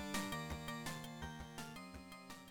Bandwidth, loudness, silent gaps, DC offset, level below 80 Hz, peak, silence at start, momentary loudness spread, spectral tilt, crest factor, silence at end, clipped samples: 17.5 kHz; -47 LUFS; none; under 0.1%; -60 dBFS; -30 dBFS; 0 s; 11 LU; -4 dB/octave; 18 dB; 0 s; under 0.1%